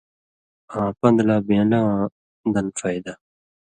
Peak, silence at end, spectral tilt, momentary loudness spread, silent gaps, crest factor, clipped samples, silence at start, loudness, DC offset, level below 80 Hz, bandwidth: -4 dBFS; 0.55 s; -7 dB/octave; 12 LU; 2.12-2.44 s; 18 dB; under 0.1%; 0.7 s; -21 LUFS; under 0.1%; -54 dBFS; 9.6 kHz